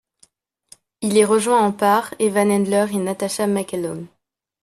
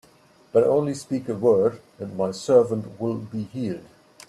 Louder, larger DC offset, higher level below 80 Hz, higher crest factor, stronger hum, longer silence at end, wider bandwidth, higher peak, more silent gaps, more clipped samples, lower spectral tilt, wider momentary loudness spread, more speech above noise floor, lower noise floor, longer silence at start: first, -19 LUFS vs -23 LUFS; neither; about the same, -64 dBFS vs -64 dBFS; about the same, 18 dB vs 18 dB; neither; about the same, 0.55 s vs 0.45 s; first, 13.5 kHz vs 12 kHz; first, -2 dBFS vs -6 dBFS; neither; neither; second, -5 dB/octave vs -7 dB/octave; about the same, 11 LU vs 12 LU; first, 40 dB vs 33 dB; about the same, -58 dBFS vs -55 dBFS; first, 1 s vs 0.55 s